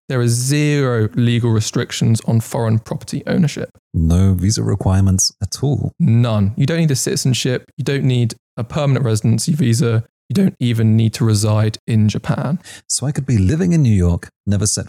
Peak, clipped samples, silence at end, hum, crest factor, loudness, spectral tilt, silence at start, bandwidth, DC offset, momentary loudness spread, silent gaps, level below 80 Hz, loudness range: -6 dBFS; under 0.1%; 0 s; none; 10 dB; -17 LUFS; -5.5 dB/octave; 0.1 s; 15 kHz; under 0.1%; 7 LU; 3.79-3.91 s, 7.73-7.77 s, 8.39-8.57 s, 10.09-10.29 s, 11.79-11.87 s, 14.36-14.44 s; -40 dBFS; 2 LU